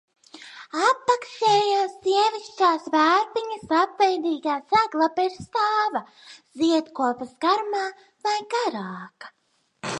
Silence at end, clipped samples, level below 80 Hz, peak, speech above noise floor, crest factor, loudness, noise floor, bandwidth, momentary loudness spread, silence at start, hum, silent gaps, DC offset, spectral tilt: 0 s; under 0.1%; -68 dBFS; -6 dBFS; 21 dB; 18 dB; -23 LUFS; -44 dBFS; 10.5 kHz; 13 LU; 0.35 s; none; none; under 0.1%; -3.5 dB/octave